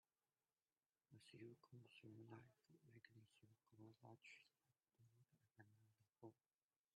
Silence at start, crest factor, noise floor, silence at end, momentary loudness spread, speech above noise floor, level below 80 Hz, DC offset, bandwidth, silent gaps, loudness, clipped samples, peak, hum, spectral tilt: 1.1 s; 20 dB; under -90 dBFS; 0.6 s; 5 LU; over 22 dB; under -90 dBFS; under 0.1%; 7.4 kHz; none; -66 LUFS; under 0.1%; -50 dBFS; none; -5 dB/octave